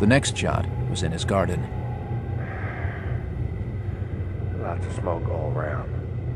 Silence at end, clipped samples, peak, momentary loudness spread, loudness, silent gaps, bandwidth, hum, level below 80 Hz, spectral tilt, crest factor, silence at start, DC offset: 0 s; under 0.1%; -6 dBFS; 7 LU; -27 LUFS; none; 11.5 kHz; none; -36 dBFS; -6 dB/octave; 20 dB; 0 s; under 0.1%